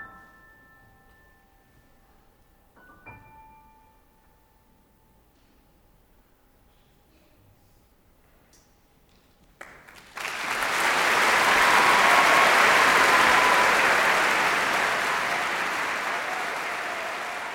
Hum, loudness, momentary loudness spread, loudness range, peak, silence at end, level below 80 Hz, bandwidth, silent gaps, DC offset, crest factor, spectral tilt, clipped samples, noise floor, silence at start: none; -20 LUFS; 13 LU; 12 LU; -6 dBFS; 0 s; -58 dBFS; over 20 kHz; none; under 0.1%; 20 dB; -1 dB/octave; under 0.1%; -60 dBFS; 0 s